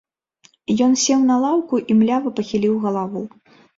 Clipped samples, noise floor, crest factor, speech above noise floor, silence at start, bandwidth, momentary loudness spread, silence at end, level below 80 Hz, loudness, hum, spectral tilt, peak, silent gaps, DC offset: under 0.1%; -57 dBFS; 14 dB; 39 dB; 0.7 s; 7.8 kHz; 12 LU; 0.5 s; -60 dBFS; -18 LUFS; none; -4.5 dB/octave; -6 dBFS; none; under 0.1%